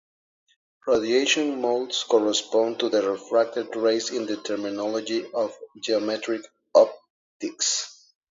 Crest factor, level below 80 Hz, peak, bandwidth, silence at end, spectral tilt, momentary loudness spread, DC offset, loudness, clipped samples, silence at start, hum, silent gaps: 22 dB; -70 dBFS; -4 dBFS; 7.8 kHz; 0.4 s; -2 dB/octave; 10 LU; under 0.1%; -24 LUFS; under 0.1%; 0.85 s; none; 7.10-7.40 s